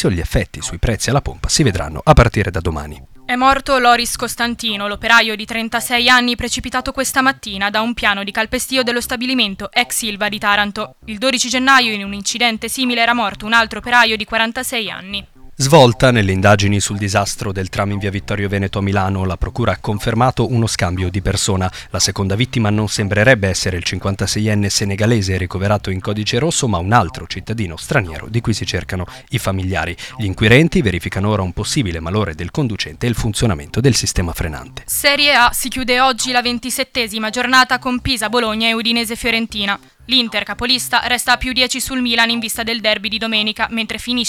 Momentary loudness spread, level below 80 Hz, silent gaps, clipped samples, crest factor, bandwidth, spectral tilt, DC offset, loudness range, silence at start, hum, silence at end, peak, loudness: 9 LU; -32 dBFS; none; under 0.1%; 16 dB; 17.5 kHz; -4 dB/octave; under 0.1%; 4 LU; 0 s; none; 0 s; 0 dBFS; -16 LUFS